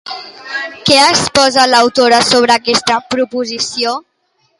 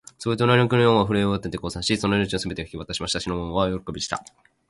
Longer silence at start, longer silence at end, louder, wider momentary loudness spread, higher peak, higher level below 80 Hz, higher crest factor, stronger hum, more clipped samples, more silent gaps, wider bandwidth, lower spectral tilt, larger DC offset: second, 0.05 s vs 0.2 s; first, 0.6 s vs 0.45 s; first, -11 LUFS vs -23 LUFS; about the same, 13 LU vs 12 LU; first, 0 dBFS vs -4 dBFS; about the same, -48 dBFS vs -44 dBFS; second, 12 dB vs 18 dB; neither; neither; neither; about the same, 11.5 kHz vs 11.5 kHz; second, -2 dB/octave vs -5 dB/octave; neither